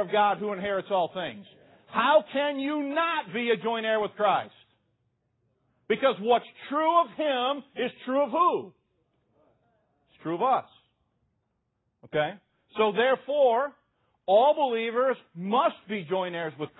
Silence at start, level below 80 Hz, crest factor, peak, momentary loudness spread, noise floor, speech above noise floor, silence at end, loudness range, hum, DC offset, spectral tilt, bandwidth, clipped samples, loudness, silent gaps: 0 s; -74 dBFS; 18 dB; -10 dBFS; 10 LU; -77 dBFS; 51 dB; 0.15 s; 6 LU; none; under 0.1%; -9 dB/octave; 4.1 kHz; under 0.1%; -26 LUFS; none